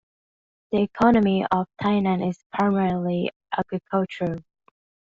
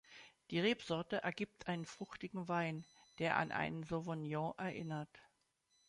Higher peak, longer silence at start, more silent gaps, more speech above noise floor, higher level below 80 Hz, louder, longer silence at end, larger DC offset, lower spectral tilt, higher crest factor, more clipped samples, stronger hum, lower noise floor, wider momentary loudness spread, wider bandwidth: first, -4 dBFS vs -20 dBFS; first, 0.7 s vs 0.1 s; first, 2.46-2.50 s, 3.36-3.40 s vs none; first, over 68 dB vs 39 dB; first, -54 dBFS vs -74 dBFS; first, -23 LUFS vs -41 LUFS; about the same, 0.7 s vs 0.65 s; neither; about the same, -6 dB/octave vs -6 dB/octave; about the same, 20 dB vs 22 dB; neither; neither; first, under -90 dBFS vs -80 dBFS; second, 9 LU vs 12 LU; second, 7.4 kHz vs 11 kHz